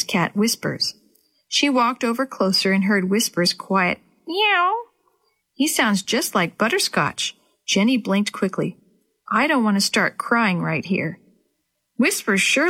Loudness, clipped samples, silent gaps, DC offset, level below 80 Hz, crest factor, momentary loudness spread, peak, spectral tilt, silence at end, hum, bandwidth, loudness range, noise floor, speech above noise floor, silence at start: -20 LUFS; under 0.1%; none; under 0.1%; -66 dBFS; 16 dB; 7 LU; -4 dBFS; -3.5 dB/octave; 0 s; none; 16.5 kHz; 2 LU; -73 dBFS; 53 dB; 0 s